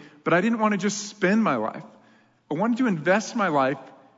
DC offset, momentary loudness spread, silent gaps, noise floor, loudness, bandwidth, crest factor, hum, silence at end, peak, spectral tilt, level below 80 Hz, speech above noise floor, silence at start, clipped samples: under 0.1%; 10 LU; none; -58 dBFS; -24 LUFS; 7.8 kHz; 16 dB; none; 0.25 s; -8 dBFS; -5 dB/octave; -76 dBFS; 35 dB; 0 s; under 0.1%